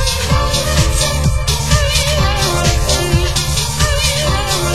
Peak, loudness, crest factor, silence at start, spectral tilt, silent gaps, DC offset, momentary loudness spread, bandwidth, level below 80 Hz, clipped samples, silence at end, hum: 0 dBFS; -14 LUFS; 14 dB; 0 s; -3.5 dB/octave; none; 3%; 2 LU; 16 kHz; -18 dBFS; under 0.1%; 0 s; none